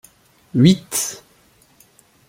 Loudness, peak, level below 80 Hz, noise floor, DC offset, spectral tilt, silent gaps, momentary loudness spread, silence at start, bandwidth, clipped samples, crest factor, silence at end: -17 LUFS; -2 dBFS; -54 dBFS; -55 dBFS; under 0.1%; -5 dB/octave; none; 13 LU; 0.55 s; 16.5 kHz; under 0.1%; 18 dB; 1.15 s